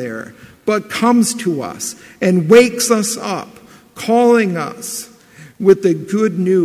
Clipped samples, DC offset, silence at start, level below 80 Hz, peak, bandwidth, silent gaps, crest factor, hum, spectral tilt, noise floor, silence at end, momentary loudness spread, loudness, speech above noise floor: under 0.1%; under 0.1%; 0 s; -58 dBFS; 0 dBFS; 16 kHz; none; 16 dB; none; -5 dB/octave; -42 dBFS; 0 s; 16 LU; -15 LUFS; 27 dB